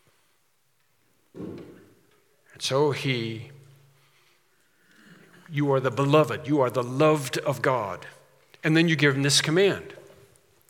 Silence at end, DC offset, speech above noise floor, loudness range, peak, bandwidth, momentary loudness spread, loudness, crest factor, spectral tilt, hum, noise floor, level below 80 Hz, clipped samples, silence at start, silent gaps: 0.75 s; under 0.1%; 47 dB; 8 LU; -6 dBFS; 17.5 kHz; 20 LU; -24 LUFS; 20 dB; -4.5 dB/octave; none; -70 dBFS; -74 dBFS; under 0.1%; 1.35 s; none